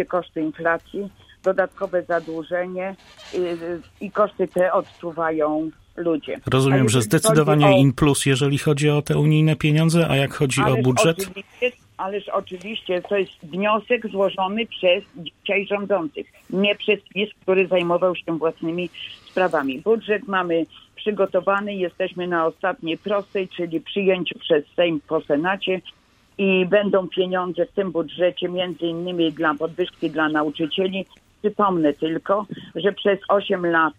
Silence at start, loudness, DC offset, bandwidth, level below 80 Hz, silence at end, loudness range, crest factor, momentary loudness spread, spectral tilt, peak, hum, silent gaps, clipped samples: 0 s; -21 LUFS; under 0.1%; 16 kHz; -54 dBFS; 0.05 s; 6 LU; 18 dB; 11 LU; -5.5 dB/octave; -2 dBFS; none; none; under 0.1%